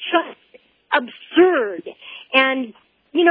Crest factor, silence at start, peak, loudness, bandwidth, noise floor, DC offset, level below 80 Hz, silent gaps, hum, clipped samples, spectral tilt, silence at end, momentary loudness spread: 18 dB; 0 s; -2 dBFS; -19 LUFS; 5 kHz; -53 dBFS; under 0.1%; -72 dBFS; none; none; under 0.1%; -6 dB/octave; 0 s; 18 LU